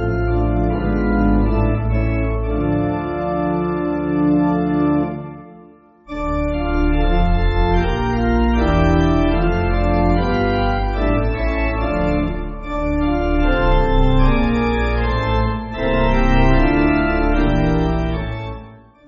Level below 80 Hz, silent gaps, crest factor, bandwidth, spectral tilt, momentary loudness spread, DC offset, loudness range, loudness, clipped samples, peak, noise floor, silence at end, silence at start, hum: -20 dBFS; none; 14 dB; 6.6 kHz; -6.5 dB/octave; 6 LU; under 0.1%; 3 LU; -18 LUFS; under 0.1%; -2 dBFS; -45 dBFS; 0.3 s; 0 s; none